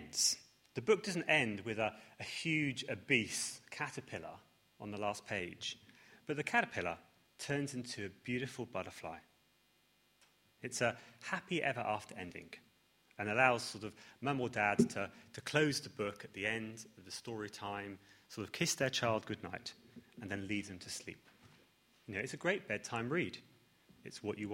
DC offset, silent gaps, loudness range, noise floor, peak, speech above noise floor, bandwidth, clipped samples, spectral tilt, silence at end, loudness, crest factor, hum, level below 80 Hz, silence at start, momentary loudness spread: under 0.1%; none; 8 LU; -73 dBFS; -14 dBFS; 35 dB; 16.5 kHz; under 0.1%; -3.5 dB/octave; 0 s; -38 LUFS; 26 dB; none; -74 dBFS; 0 s; 17 LU